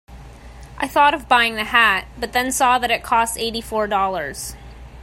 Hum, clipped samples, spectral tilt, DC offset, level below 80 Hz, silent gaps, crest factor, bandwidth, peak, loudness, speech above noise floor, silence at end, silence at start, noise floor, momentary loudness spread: none; under 0.1%; -2 dB/octave; under 0.1%; -42 dBFS; none; 20 dB; 16 kHz; 0 dBFS; -18 LUFS; 20 dB; 0 s; 0.1 s; -39 dBFS; 12 LU